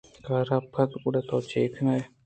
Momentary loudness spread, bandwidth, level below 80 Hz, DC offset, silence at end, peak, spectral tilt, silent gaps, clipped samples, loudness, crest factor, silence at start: 3 LU; 8.8 kHz; -64 dBFS; under 0.1%; 0.2 s; -10 dBFS; -8 dB/octave; none; under 0.1%; -28 LUFS; 18 dB; 0.25 s